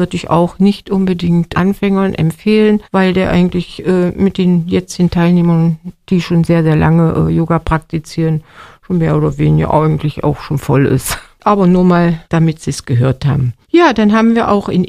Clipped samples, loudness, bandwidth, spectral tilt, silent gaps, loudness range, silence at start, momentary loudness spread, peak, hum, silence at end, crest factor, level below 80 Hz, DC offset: under 0.1%; -13 LUFS; 14.5 kHz; -7.5 dB/octave; none; 2 LU; 0 s; 7 LU; 0 dBFS; none; 0 s; 12 dB; -34 dBFS; under 0.1%